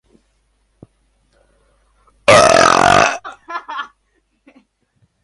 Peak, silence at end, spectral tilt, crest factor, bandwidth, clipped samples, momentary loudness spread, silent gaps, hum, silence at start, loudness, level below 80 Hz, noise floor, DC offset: 0 dBFS; 1.4 s; -3 dB/octave; 18 dB; 11.5 kHz; under 0.1%; 20 LU; none; none; 2.3 s; -11 LUFS; -44 dBFS; -64 dBFS; under 0.1%